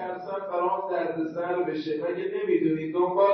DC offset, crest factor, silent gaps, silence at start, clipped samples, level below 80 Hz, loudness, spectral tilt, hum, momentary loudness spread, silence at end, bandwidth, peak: under 0.1%; 16 dB; none; 0 s; under 0.1%; -72 dBFS; -28 LUFS; -8.5 dB/octave; none; 6 LU; 0 s; 6 kHz; -10 dBFS